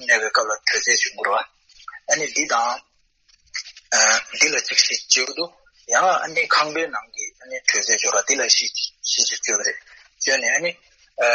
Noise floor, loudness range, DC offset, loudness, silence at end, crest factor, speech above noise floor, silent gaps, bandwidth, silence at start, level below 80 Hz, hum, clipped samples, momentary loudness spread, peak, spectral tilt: -60 dBFS; 3 LU; under 0.1%; -19 LUFS; 0 s; 20 dB; 39 dB; none; 8.4 kHz; 0 s; -68 dBFS; none; under 0.1%; 15 LU; -2 dBFS; 1.5 dB/octave